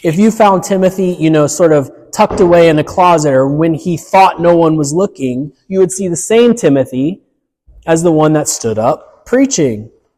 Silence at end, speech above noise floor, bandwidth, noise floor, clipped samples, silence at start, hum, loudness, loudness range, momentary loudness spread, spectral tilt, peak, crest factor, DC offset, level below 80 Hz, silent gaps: 0.3 s; 39 dB; 15 kHz; -49 dBFS; under 0.1%; 0.05 s; none; -11 LUFS; 4 LU; 10 LU; -5.5 dB/octave; 0 dBFS; 10 dB; under 0.1%; -44 dBFS; none